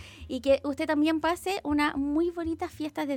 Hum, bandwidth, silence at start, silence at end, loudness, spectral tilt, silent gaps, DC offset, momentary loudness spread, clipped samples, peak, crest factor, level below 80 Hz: none; 16.5 kHz; 0 s; 0 s; -28 LUFS; -5 dB/octave; none; under 0.1%; 8 LU; under 0.1%; -12 dBFS; 16 dB; -52 dBFS